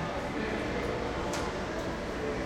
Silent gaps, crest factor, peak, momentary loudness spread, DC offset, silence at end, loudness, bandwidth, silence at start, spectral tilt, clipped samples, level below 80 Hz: none; 14 dB; -20 dBFS; 2 LU; under 0.1%; 0 s; -34 LUFS; 16 kHz; 0 s; -5 dB/octave; under 0.1%; -44 dBFS